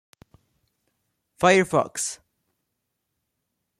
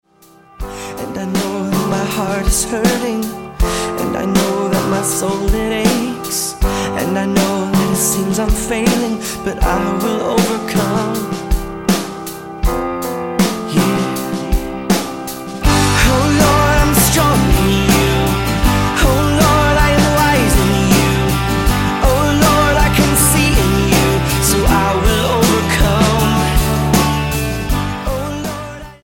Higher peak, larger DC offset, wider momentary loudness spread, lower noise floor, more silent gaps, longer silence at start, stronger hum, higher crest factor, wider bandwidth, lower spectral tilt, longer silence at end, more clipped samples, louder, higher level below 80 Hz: second, -4 dBFS vs 0 dBFS; second, under 0.1% vs 0.5%; first, 12 LU vs 9 LU; first, -79 dBFS vs -46 dBFS; neither; first, 1.4 s vs 0.6 s; neither; first, 22 dB vs 14 dB; second, 14 kHz vs 17 kHz; about the same, -4 dB/octave vs -4.5 dB/octave; first, 1.65 s vs 0.1 s; neither; second, -22 LUFS vs -15 LUFS; second, -64 dBFS vs -22 dBFS